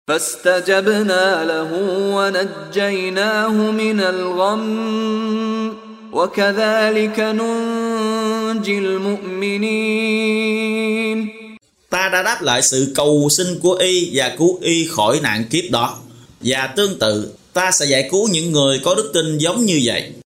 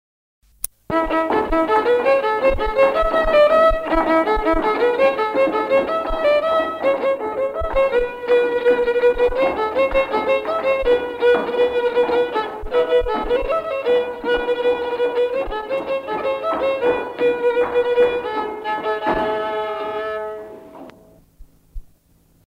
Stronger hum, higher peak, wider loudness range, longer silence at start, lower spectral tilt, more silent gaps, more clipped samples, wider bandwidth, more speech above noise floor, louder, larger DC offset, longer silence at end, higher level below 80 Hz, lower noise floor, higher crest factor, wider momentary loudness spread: neither; about the same, -2 dBFS vs -2 dBFS; about the same, 3 LU vs 5 LU; second, 0.1 s vs 0.65 s; about the same, -3.5 dB/octave vs -4.5 dB/octave; neither; neither; about the same, 16 kHz vs 16 kHz; second, 24 dB vs 38 dB; about the same, -17 LUFS vs -19 LUFS; neither; second, 0.05 s vs 0.6 s; second, -58 dBFS vs -36 dBFS; second, -41 dBFS vs -56 dBFS; about the same, 16 dB vs 18 dB; about the same, 6 LU vs 8 LU